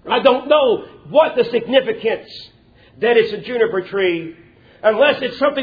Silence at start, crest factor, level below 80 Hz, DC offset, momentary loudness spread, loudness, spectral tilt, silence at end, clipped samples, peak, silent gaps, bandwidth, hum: 0.05 s; 18 dB; -58 dBFS; under 0.1%; 10 LU; -17 LUFS; -6.5 dB/octave; 0 s; under 0.1%; 0 dBFS; none; 5 kHz; none